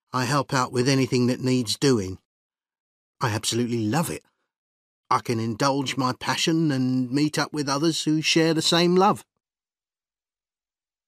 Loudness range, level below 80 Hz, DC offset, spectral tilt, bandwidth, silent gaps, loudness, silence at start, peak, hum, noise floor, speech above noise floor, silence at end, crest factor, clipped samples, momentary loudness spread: 5 LU; -64 dBFS; under 0.1%; -4.5 dB/octave; 15.5 kHz; 2.25-2.50 s, 2.80-3.14 s, 4.58-5.03 s; -23 LUFS; 0.15 s; -6 dBFS; none; under -90 dBFS; over 67 dB; 1.85 s; 18 dB; under 0.1%; 7 LU